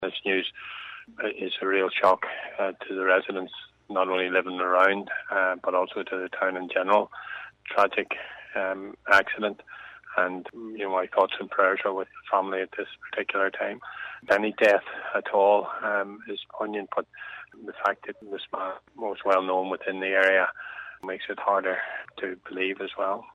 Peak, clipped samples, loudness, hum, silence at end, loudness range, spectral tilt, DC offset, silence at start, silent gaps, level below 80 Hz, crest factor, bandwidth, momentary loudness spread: -8 dBFS; under 0.1%; -26 LUFS; none; 0.1 s; 3 LU; -4.5 dB/octave; under 0.1%; 0 s; none; -72 dBFS; 20 dB; 10.5 kHz; 16 LU